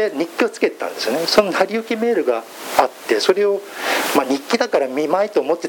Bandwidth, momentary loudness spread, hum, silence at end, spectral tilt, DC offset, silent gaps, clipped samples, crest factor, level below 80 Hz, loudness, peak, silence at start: 17.5 kHz; 6 LU; none; 0 s; -3 dB/octave; under 0.1%; none; under 0.1%; 18 dB; -60 dBFS; -19 LUFS; 0 dBFS; 0 s